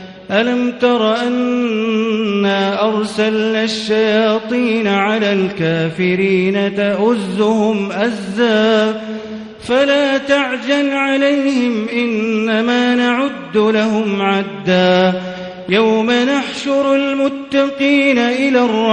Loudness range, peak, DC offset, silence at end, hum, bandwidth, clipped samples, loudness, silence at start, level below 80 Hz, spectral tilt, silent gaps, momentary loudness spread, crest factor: 1 LU; 0 dBFS; under 0.1%; 0 s; none; 10 kHz; under 0.1%; -15 LUFS; 0 s; -56 dBFS; -5.5 dB/octave; none; 5 LU; 14 dB